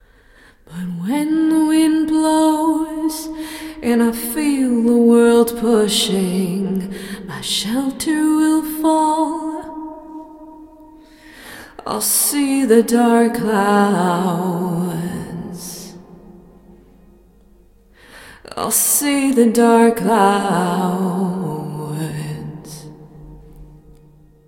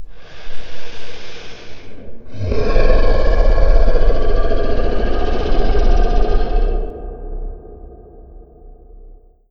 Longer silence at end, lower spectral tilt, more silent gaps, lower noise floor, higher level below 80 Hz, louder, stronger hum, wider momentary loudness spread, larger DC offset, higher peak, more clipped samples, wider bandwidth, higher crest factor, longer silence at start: about the same, 0.7 s vs 0.8 s; second, -4.5 dB/octave vs -7 dB/octave; neither; first, -49 dBFS vs -41 dBFS; second, -50 dBFS vs -16 dBFS; first, -16 LUFS vs -19 LUFS; neither; second, 17 LU vs 22 LU; neither; about the same, 0 dBFS vs 0 dBFS; neither; first, 16.5 kHz vs 6 kHz; first, 18 dB vs 12 dB; first, 0.7 s vs 0 s